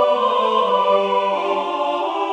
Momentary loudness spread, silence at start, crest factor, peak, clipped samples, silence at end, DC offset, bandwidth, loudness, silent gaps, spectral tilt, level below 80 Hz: 5 LU; 0 s; 14 dB; -4 dBFS; under 0.1%; 0 s; under 0.1%; 9.6 kHz; -18 LUFS; none; -4.5 dB/octave; -74 dBFS